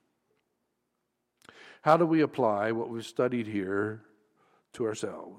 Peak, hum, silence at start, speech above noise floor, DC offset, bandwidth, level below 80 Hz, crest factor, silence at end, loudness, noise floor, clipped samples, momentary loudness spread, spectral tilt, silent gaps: -10 dBFS; none; 1.65 s; 52 dB; under 0.1%; 12.5 kHz; -76 dBFS; 22 dB; 0 s; -29 LUFS; -81 dBFS; under 0.1%; 11 LU; -6.5 dB/octave; none